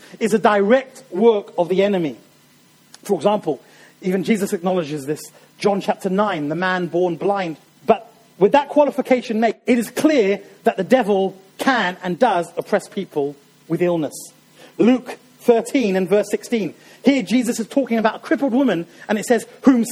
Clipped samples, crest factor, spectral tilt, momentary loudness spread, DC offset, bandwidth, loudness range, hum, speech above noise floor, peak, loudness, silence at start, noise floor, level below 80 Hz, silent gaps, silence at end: under 0.1%; 18 dB; -5.5 dB/octave; 10 LU; under 0.1%; 16 kHz; 4 LU; none; 34 dB; 0 dBFS; -19 LUFS; 0.15 s; -53 dBFS; -64 dBFS; none; 0 s